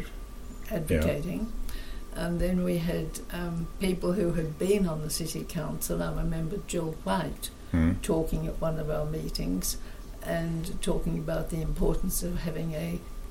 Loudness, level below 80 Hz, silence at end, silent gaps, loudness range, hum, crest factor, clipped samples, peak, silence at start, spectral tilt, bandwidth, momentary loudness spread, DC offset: -31 LUFS; -36 dBFS; 0 s; none; 2 LU; none; 16 dB; under 0.1%; -14 dBFS; 0 s; -5.5 dB/octave; 16.5 kHz; 10 LU; under 0.1%